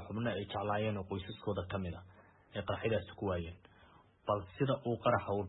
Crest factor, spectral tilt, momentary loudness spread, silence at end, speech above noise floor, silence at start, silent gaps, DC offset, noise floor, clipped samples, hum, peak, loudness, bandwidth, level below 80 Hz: 20 dB; -4.5 dB/octave; 12 LU; 0 s; 27 dB; 0 s; none; under 0.1%; -63 dBFS; under 0.1%; none; -18 dBFS; -38 LUFS; 3.9 kHz; -62 dBFS